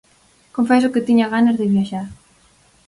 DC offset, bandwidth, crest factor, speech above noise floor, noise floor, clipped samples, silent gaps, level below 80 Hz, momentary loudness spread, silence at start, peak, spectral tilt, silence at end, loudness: under 0.1%; 11.5 kHz; 14 dB; 39 dB; -55 dBFS; under 0.1%; none; -56 dBFS; 14 LU; 0.55 s; -4 dBFS; -7 dB/octave; 0.75 s; -17 LUFS